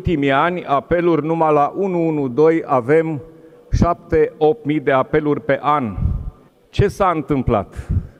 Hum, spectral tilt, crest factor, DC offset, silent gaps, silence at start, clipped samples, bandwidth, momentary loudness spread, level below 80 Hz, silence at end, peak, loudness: none; -8 dB/octave; 16 dB; under 0.1%; none; 0 s; under 0.1%; 11.5 kHz; 8 LU; -32 dBFS; 0.1 s; -2 dBFS; -18 LUFS